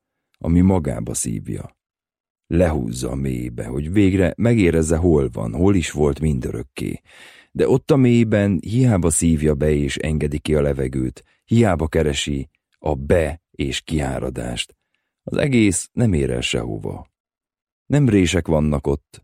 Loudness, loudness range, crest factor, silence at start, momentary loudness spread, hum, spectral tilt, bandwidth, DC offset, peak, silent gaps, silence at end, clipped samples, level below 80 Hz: -20 LUFS; 4 LU; 16 dB; 0.45 s; 12 LU; none; -6 dB/octave; 15.5 kHz; under 0.1%; -4 dBFS; 2.20-2.24 s, 2.30-2.35 s, 17.20-17.25 s, 17.62-17.86 s; 0.25 s; under 0.1%; -34 dBFS